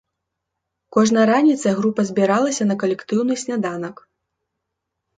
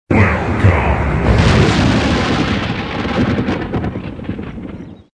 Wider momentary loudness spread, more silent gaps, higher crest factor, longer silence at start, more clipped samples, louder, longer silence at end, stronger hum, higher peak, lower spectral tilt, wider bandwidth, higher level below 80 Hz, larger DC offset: second, 9 LU vs 14 LU; neither; about the same, 18 dB vs 14 dB; first, 0.95 s vs 0.1 s; neither; second, -19 LUFS vs -15 LUFS; first, 1.25 s vs 0.2 s; neither; about the same, -2 dBFS vs 0 dBFS; about the same, -5.5 dB/octave vs -6.5 dB/octave; about the same, 9.4 kHz vs 10 kHz; second, -66 dBFS vs -24 dBFS; neither